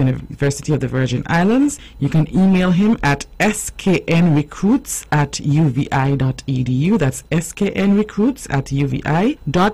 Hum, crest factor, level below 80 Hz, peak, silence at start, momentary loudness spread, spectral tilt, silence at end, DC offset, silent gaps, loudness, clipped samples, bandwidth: none; 10 dB; -38 dBFS; -8 dBFS; 0 s; 6 LU; -6 dB/octave; 0 s; 0.6%; none; -17 LUFS; under 0.1%; 14 kHz